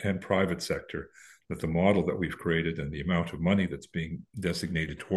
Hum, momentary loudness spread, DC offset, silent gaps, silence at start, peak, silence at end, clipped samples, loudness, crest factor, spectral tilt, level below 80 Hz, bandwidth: none; 11 LU; under 0.1%; none; 0 s; -10 dBFS; 0 s; under 0.1%; -30 LUFS; 20 dB; -6.5 dB/octave; -50 dBFS; 12.5 kHz